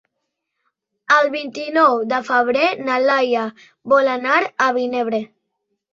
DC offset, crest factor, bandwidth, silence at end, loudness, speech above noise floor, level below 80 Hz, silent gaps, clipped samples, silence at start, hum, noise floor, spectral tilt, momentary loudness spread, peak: under 0.1%; 18 dB; 7.6 kHz; 0.65 s; -17 LUFS; 59 dB; -68 dBFS; none; under 0.1%; 1.1 s; none; -77 dBFS; -4 dB/octave; 10 LU; -2 dBFS